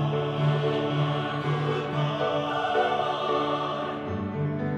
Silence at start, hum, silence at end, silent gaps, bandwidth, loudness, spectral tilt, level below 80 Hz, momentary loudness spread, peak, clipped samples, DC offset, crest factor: 0 s; none; 0 s; none; 7.4 kHz; -27 LUFS; -7.5 dB/octave; -60 dBFS; 5 LU; -12 dBFS; under 0.1%; under 0.1%; 14 dB